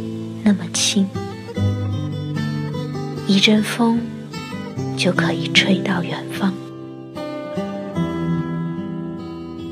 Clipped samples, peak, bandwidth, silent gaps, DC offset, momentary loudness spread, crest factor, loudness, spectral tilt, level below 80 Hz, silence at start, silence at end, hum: under 0.1%; 0 dBFS; 15 kHz; none; under 0.1%; 15 LU; 22 dB; -21 LUFS; -4.5 dB/octave; -54 dBFS; 0 s; 0 s; none